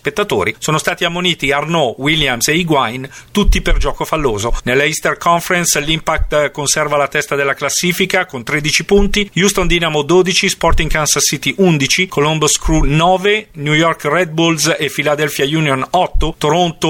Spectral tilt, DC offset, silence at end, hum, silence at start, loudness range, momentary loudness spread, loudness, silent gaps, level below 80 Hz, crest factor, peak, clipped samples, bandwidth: -3.5 dB/octave; under 0.1%; 0 s; none; 0.05 s; 2 LU; 4 LU; -14 LUFS; none; -24 dBFS; 14 dB; 0 dBFS; under 0.1%; 17 kHz